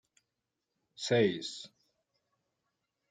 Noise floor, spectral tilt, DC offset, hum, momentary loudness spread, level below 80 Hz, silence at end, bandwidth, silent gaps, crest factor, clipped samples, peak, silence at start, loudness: -87 dBFS; -5 dB/octave; under 0.1%; none; 18 LU; -80 dBFS; 1.45 s; 9.4 kHz; none; 22 dB; under 0.1%; -16 dBFS; 1 s; -32 LUFS